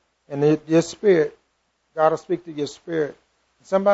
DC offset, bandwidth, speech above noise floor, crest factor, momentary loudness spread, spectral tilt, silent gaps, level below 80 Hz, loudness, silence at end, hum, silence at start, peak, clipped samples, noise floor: under 0.1%; 8 kHz; 49 dB; 18 dB; 12 LU; -6.5 dB/octave; none; -66 dBFS; -22 LUFS; 0 s; none; 0.3 s; -4 dBFS; under 0.1%; -70 dBFS